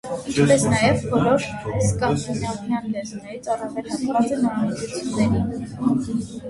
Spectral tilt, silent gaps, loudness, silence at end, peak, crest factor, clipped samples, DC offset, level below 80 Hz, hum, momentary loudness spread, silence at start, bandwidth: -5.5 dB/octave; none; -22 LUFS; 0 s; -4 dBFS; 18 dB; under 0.1%; under 0.1%; -44 dBFS; none; 10 LU; 0.05 s; 11.5 kHz